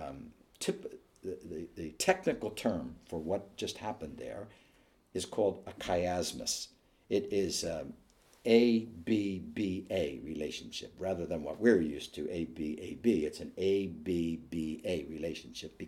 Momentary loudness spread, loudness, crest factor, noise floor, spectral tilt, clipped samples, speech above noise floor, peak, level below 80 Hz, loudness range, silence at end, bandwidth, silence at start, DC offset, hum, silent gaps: 14 LU; -35 LUFS; 22 dB; -66 dBFS; -4.5 dB/octave; under 0.1%; 33 dB; -12 dBFS; -60 dBFS; 4 LU; 0 s; 16.5 kHz; 0 s; under 0.1%; none; none